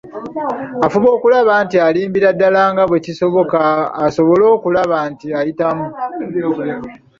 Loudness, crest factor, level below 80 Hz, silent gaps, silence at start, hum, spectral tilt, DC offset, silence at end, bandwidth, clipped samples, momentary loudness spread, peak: -14 LUFS; 12 dB; -54 dBFS; none; 0.05 s; none; -7 dB/octave; under 0.1%; 0.25 s; 7.4 kHz; under 0.1%; 10 LU; -2 dBFS